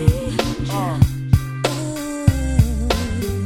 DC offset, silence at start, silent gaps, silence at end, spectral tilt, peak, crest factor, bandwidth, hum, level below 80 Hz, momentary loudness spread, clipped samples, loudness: under 0.1%; 0 s; none; 0 s; -6 dB/octave; 0 dBFS; 18 dB; 17.5 kHz; none; -26 dBFS; 5 LU; under 0.1%; -20 LUFS